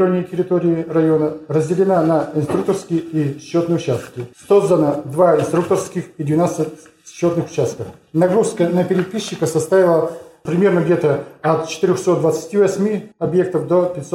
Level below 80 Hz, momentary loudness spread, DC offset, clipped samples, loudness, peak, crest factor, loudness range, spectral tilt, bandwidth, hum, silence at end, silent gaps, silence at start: -58 dBFS; 8 LU; under 0.1%; under 0.1%; -17 LUFS; -2 dBFS; 14 dB; 2 LU; -7 dB/octave; 14 kHz; none; 0 s; none; 0 s